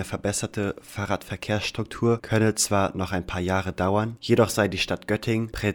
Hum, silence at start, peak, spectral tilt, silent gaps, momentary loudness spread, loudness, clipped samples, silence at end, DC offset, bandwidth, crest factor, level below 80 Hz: none; 0 s; -8 dBFS; -4.5 dB/octave; none; 8 LU; -25 LUFS; under 0.1%; 0 s; under 0.1%; 18.5 kHz; 18 dB; -48 dBFS